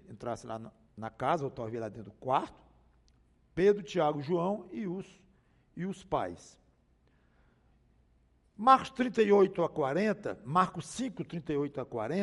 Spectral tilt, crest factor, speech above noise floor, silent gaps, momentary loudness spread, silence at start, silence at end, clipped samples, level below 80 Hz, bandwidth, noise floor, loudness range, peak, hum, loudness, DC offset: -6.5 dB/octave; 24 dB; 37 dB; none; 18 LU; 0.1 s; 0 s; under 0.1%; -64 dBFS; 11.5 kHz; -68 dBFS; 12 LU; -8 dBFS; none; -31 LUFS; under 0.1%